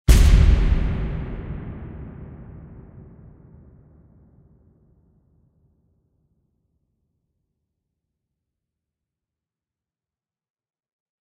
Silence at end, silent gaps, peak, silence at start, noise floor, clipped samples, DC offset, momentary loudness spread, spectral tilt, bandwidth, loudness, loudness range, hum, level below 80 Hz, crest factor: 8.9 s; none; -2 dBFS; 0.1 s; under -90 dBFS; under 0.1%; under 0.1%; 28 LU; -6 dB/octave; 15 kHz; -21 LUFS; 27 LU; none; -26 dBFS; 22 dB